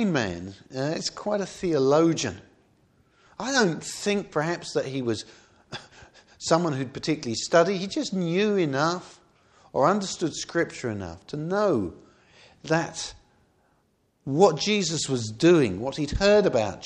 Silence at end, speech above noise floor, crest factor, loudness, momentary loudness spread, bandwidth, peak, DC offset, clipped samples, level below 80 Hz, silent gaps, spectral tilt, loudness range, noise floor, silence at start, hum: 0 s; 43 dB; 22 dB; -25 LUFS; 15 LU; 12 kHz; -4 dBFS; under 0.1%; under 0.1%; -50 dBFS; none; -4.5 dB/octave; 4 LU; -68 dBFS; 0 s; none